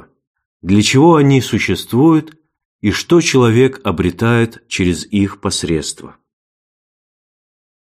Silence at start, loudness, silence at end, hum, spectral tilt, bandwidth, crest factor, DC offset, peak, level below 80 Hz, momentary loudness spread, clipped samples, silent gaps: 0.65 s; -14 LUFS; 1.8 s; none; -5.5 dB/octave; 15.5 kHz; 14 dB; under 0.1%; 0 dBFS; -42 dBFS; 10 LU; under 0.1%; 2.65-2.79 s